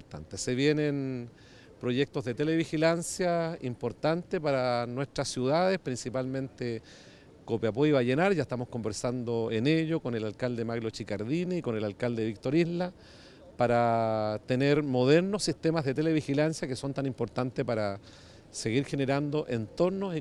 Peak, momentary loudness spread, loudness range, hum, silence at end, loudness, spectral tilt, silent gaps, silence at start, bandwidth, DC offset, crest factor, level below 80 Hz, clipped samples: -10 dBFS; 9 LU; 4 LU; none; 0 s; -30 LUFS; -6 dB/octave; none; 0.1 s; 13 kHz; under 0.1%; 18 dB; -60 dBFS; under 0.1%